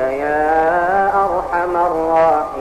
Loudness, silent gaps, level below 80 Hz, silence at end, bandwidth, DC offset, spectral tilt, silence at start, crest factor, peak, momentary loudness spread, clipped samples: -16 LUFS; none; -42 dBFS; 0 s; 13.5 kHz; under 0.1%; -6.5 dB/octave; 0 s; 12 dB; -4 dBFS; 4 LU; under 0.1%